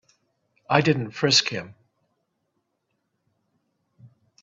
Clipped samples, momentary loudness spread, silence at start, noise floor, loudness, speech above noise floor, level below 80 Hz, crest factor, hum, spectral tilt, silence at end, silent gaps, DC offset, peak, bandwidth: under 0.1%; 11 LU; 0.7 s; -76 dBFS; -21 LUFS; 54 dB; -66 dBFS; 26 dB; none; -3.5 dB/octave; 0.35 s; none; under 0.1%; -2 dBFS; 8.4 kHz